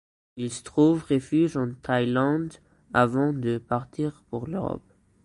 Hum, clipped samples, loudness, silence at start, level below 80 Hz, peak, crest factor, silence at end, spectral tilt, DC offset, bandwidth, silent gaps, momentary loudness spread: none; under 0.1%; -26 LUFS; 0.35 s; -56 dBFS; -6 dBFS; 20 dB; 0.45 s; -7 dB/octave; under 0.1%; 11 kHz; none; 12 LU